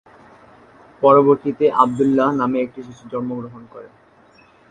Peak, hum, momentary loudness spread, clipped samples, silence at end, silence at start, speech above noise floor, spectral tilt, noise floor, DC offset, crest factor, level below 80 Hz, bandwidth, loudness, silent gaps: 0 dBFS; none; 19 LU; under 0.1%; 0.85 s; 1 s; 34 dB; -8 dB/octave; -51 dBFS; under 0.1%; 20 dB; -60 dBFS; 9.2 kHz; -17 LUFS; none